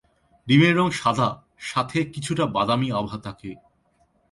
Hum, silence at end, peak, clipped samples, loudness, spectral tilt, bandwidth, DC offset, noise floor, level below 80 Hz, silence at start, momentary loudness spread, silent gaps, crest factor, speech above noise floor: none; 0.75 s; -4 dBFS; under 0.1%; -22 LUFS; -6 dB/octave; 11.5 kHz; under 0.1%; -64 dBFS; -56 dBFS; 0.45 s; 18 LU; none; 18 dB; 42 dB